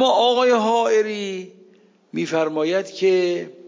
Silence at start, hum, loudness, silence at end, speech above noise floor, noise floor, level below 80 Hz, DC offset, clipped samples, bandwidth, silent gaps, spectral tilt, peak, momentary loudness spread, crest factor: 0 s; none; -20 LUFS; 0 s; 33 dB; -53 dBFS; -80 dBFS; under 0.1%; under 0.1%; 7.6 kHz; none; -4 dB/octave; -6 dBFS; 12 LU; 14 dB